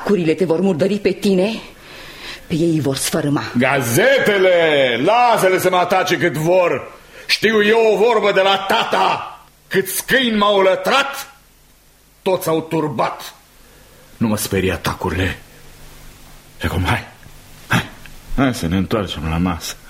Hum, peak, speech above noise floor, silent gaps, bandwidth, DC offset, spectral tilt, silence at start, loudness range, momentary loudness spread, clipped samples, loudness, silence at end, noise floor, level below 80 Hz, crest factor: none; -2 dBFS; 34 dB; none; 16.5 kHz; under 0.1%; -4.5 dB/octave; 0 s; 9 LU; 14 LU; under 0.1%; -16 LUFS; 0 s; -50 dBFS; -40 dBFS; 16 dB